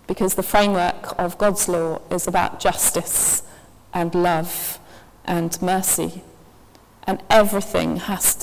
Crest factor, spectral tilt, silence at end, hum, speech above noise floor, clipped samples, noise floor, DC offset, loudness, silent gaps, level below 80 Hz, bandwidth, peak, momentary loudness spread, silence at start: 20 dB; -3.5 dB/octave; 0 s; none; 30 dB; under 0.1%; -50 dBFS; under 0.1%; -20 LUFS; none; -44 dBFS; 16 kHz; 0 dBFS; 10 LU; 0.1 s